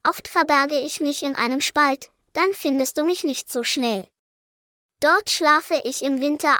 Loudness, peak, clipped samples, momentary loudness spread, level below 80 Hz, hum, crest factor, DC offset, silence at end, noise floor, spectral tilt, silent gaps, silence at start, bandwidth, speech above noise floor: -21 LUFS; -4 dBFS; under 0.1%; 7 LU; -66 dBFS; none; 18 dB; under 0.1%; 0 s; under -90 dBFS; -2 dB/octave; 4.19-4.89 s; 0.05 s; over 20 kHz; over 69 dB